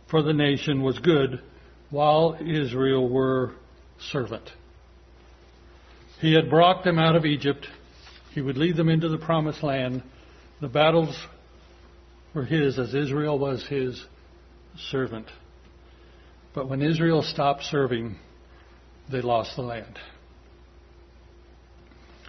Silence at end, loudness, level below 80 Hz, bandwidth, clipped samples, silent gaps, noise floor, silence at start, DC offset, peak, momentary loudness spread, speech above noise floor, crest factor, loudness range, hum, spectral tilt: 0 s; -24 LUFS; -52 dBFS; 6.4 kHz; under 0.1%; none; -51 dBFS; 0.1 s; under 0.1%; -6 dBFS; 17 LU; 28 dB; 20 dB; 9 LU; none; -7 dB/octave